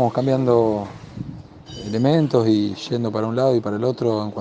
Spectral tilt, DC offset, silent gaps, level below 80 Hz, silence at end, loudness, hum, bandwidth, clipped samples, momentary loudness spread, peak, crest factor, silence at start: -8 dB/octave; under 0.1%; none; -54 dBFS; 0 s; -20 LUFS; none; 8.4 kHz; under 0.1%; 17 LU; -4 dBFS; 16 dB; 0 s